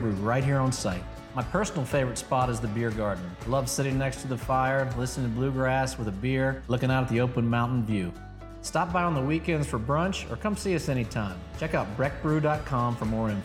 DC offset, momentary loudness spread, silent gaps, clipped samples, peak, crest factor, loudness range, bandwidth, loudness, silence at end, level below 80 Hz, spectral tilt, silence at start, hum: under 0.1%; 6 LU; none; under 0.1%; -12 dBFS; 16 dB; 2 LU; 15.5 kHz; -28 LUFS; 0 s; -44 dBFS; -6 dB/octave; 0 s; none